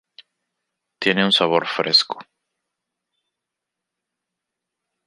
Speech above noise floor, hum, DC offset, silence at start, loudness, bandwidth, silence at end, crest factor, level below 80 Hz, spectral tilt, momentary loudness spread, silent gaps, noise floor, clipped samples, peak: 65 dB; none; under 0.1%; 1 s; -18 LUFS; 11.5 kHz; 2.85 s; 22 dB; -72 dBFS; -4 dB/octave; 10 LU; none; -84 dBFS; under 0.1%; -2 dBFS